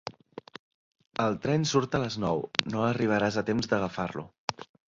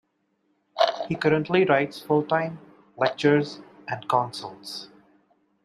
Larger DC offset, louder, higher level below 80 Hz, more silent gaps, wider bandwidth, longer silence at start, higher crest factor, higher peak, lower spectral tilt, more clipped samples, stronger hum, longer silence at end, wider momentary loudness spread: neither; second, -29 LUFS vs -24 LUFS; first, -58 dBFS vs -68 dBFS; first, 0.59-0.91 s, 4.38-4.48 s vs none; second, 7.8 kHz vs 14 kHz; second, 0.05 s vs 0.75 s; first, 28 dB vs 20 dB; first, -2 dBFS vs -6 dBFS; about the same, -5 dB/octave vs -6 dB/octave; neither; neither; second, 0.25 s vs 0.8 s; second, 12 LU vs 16 LU